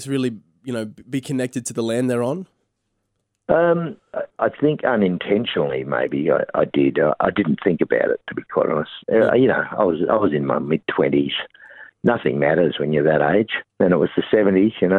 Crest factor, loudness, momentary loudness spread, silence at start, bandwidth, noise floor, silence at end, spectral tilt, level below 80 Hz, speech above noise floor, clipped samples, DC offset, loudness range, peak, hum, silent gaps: 18 dB; -20 LUFS; 10 LU; 0 s; 13 kHz; -74 dBFS; 0 s; -6.5 dB/octave; -56 dBFS; 54 dB; under 0.1%; under 0.1%; 4 LU; -2 dBFS; none; none